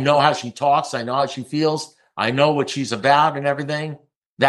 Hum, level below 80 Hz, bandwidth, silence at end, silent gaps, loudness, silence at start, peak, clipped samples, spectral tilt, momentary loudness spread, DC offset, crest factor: none; -68 dBFS; 12 kHz; 0 s; 4.16-4.37 s; -20 LUFS; 0 s; -2 dBFS; under 0.1%; -5 dB/octave; 11 LU; under 0.1%; 18 dB